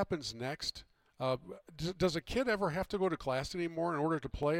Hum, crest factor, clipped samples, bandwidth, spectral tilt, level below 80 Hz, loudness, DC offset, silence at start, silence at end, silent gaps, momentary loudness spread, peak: none; 16 dB; under 0.1%; 16.5 kHz; -5.5 dB/octave; -54 dBFS; -36 LUFS; under 0.1%; 0 s; 0 s; none; 7 LU; -20 dBFS